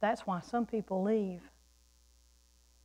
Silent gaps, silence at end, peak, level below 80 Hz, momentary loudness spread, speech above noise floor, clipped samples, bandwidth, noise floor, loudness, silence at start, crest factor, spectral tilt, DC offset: none; 1.35 s; -20 dBFS; -66 dBFS; 7 LU; 32 dB; under 0.1%; 15 kHz; -66 dBFS; -34 LUFS; 0 s; 16 dB; -7 dB/octave; under 0.1%